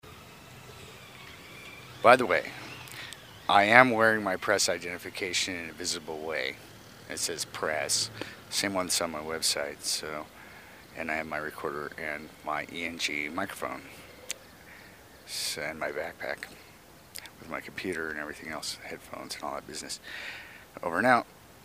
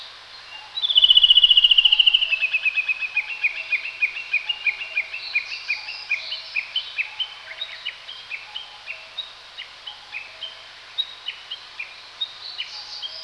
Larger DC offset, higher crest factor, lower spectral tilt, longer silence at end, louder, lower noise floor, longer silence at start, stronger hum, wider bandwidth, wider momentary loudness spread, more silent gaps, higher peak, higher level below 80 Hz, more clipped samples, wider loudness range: neither; first, 32 dB vs 22 dB; first, -2 dB/octave vs 2 dB/octave; about the same, 0 s vs 0 s; second, -29 LUFS vs -18 LUFS; first, -53 dBFS vs -42 dBFS; about the same, 0.05 s vs 0 s; neither; first, 15.5 kHz vs 11 kHz; about the same, 22 LU vs 23 LU; neither; about the same, 0 dBFS vs -2 dBFS; about the same, -64 dBFS vs -60 dBFS; neither; second, 13 LU vs 18 LU